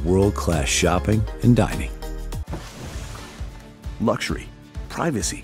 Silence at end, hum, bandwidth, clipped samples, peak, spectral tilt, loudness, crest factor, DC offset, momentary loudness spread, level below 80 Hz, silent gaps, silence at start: 0 s; none; 16 kHz; under 0.1%; -2 dBFS; -5 dB/octave; -22 LUFS; 20 dB; under 0.1%; 18 LU; -32 dBFS; none; 0 s